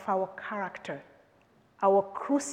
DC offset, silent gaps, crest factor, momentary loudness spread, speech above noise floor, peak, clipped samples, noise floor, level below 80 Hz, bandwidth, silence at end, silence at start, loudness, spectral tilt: under 0.1%; none; 18 dB; 15 LU; 34 dB; -12 dBFS; under 0.1%; -63 dBFS; -78 dBFS; 11.5 kHz; 0 s; 0 s; -30 LUFS; -5 dB/octave